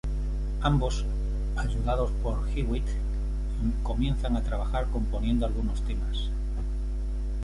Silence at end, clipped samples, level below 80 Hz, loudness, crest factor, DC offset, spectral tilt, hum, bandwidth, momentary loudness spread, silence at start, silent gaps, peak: 0 s; under 0.1%; -28 dBFS; -30 LUFS; 16 dB; under 0.1%; -7 dB/octave; none; 11 kHz; 6 LU; 0.05 s; none; -10 dBFS